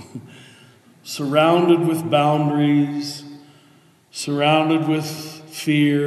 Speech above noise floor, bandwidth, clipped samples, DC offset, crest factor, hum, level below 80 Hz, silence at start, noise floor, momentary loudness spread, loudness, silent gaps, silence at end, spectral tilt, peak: 35 dB; 13 kHz; under 0.1%; under 0.1%; 18 dB; none; -76 dBFS; 0 s; -53 dBFS; 17 LU; -19 LUFS; none; 0 s; -6 dB/octave; -2 dBFS